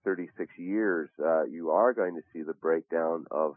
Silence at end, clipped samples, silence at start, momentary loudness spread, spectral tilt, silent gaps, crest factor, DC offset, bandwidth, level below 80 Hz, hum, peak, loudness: 0 s; under 0.1%; 0.05 s; 13 LU; -11.5 dB/octave; none; 18 dB; under 0.1%; 3.1 kHz; -88 dBFS; none; -12 dBFS; -30 LUFS